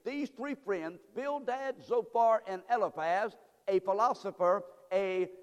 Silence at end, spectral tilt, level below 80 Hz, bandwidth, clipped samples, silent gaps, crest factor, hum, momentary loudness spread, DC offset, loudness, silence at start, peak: 0 s; -5.5 dB/octave; -82 dBFS; 12.5 kHz; under 0.1%; none; 16 dB; none; 10 LU; under 0.1%; -33 LUFS; 0.05 s; -16 dBFS